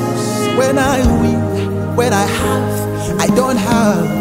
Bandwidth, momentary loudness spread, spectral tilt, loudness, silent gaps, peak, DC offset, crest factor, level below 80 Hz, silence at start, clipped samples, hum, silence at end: 16.5 kHz; 5 LU; -5.5 dB/octave; -15 LUFS; none; -2 dBFS; under 0.1%; 12 dB; -30 dBFS; 0 s; under 0.1%; none; 0 s